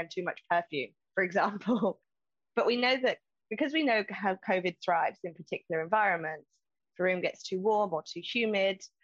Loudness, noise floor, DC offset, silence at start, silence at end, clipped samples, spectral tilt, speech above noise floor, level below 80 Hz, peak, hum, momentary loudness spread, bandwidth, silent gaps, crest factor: -31 LUFS; under -90 dBFS; under 0.1%; 0 s; 0.2 s; under 0.1%; -5 dB/octave; over 59 dB; -82 dBFS; -14 dBFS; none; 10 LU; 7.8 kHz; none; 18 dB